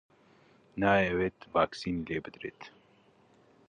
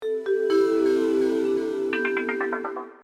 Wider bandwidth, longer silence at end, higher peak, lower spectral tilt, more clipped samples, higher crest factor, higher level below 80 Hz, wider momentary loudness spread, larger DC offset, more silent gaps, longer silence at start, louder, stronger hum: about the same, 10 kHz vs 10.5 kHz; first, 1 s vs 0.1 s; about the same, -12 dBFS vs -12 dBFS; first, -6.5 dB/octave vs -5 dB/octave; neither; first, 22 dB vs 12 dB; first, -58 dBFS vs -64 dBFS; first, 19 LU vs 6 LU; neither; neither; first, 0.75 s vs 0 s; second, -30 LUFS vs -24 LUFS; neither